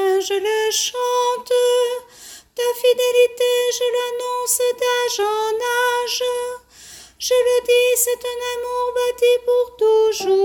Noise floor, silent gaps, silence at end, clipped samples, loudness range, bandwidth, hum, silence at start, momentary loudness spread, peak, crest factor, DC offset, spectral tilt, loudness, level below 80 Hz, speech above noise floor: -42 dBFS; none; 0 s; under 0.1%; 2 LU; 17.5 kHz; none; 0 s; 9 LU; -4 dBFS; 14 dB; under 0.1%; 0 dB/octave; -18 LUFS; -60 dBFS; 24 dB